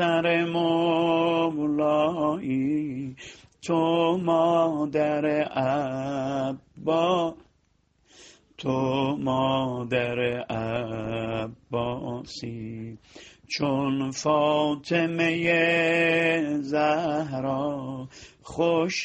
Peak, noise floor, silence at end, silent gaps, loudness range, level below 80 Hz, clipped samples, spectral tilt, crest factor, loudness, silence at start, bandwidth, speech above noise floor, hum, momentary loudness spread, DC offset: -10 dBFS; -67 dBFS; 0 s; none; 7 LU; -60 dBFS; under 0.1%; -6 dB/octave; 16 dB; -25 LUFS; 0 s; 8.8 kHz; 42 dB; none; 13 LU; under 0.1%